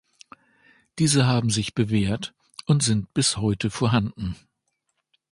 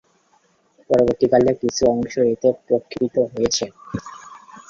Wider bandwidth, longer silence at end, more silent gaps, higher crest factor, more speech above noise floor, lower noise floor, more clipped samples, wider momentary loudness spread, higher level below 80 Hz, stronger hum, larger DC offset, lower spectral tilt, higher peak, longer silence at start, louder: first, 11.5 kHz vs 7.6 kHz; first, 1 s vs 0.1 s; neither; about the same, 18 dB vs 18 dB; first, 54 dB vs 41 dB; first, -76 dBFS vs -60 dBFS; neither; about the same, 14 LU vs 16 LU; about the same, -48 dBFS vs -50 dBFS; neither; neither; about the same, -4.5 dB/octave vs -5 dB/octave; second, -6 dBFS vs -2 dBFS; about the same, 0.95 s vs 0.9 s; second, -23 LUFS vs -19 LUFS